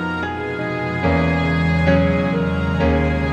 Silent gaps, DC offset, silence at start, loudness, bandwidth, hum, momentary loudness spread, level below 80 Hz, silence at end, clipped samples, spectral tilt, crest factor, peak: none; under 0.1%; 0 s; -19 LUFS; 8 kHz; none; 8 LU; -30 dBFS; 0 s; under 0.1%; -8 dB/octave; 14 dB; -4 dBFS